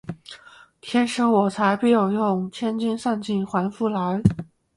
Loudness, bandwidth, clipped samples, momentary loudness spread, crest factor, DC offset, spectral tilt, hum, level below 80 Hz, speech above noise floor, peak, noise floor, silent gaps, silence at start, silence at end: -22 LUFS; 11.5 kHz; under 0.1%; 17 LU; 20 dB; under 0.1%; -6.5 dB/octave; none; -50 dBFS; 27 dB; -2 dBFS; -48 dBFS; none; 0.05 s; 0.35 s